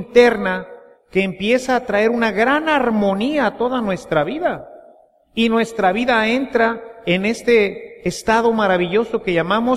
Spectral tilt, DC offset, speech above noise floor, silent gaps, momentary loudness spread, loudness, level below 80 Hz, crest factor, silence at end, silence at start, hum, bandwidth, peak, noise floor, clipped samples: -5.5 dB/octave; under 0.1%; 32 dB; none; 8 LU; -18 LUFS; -48 dBFS; 18 dB; 0 s; 0 s; none; 13.5 kHz; 0 dBFS; -49 dBFS; under 0.1%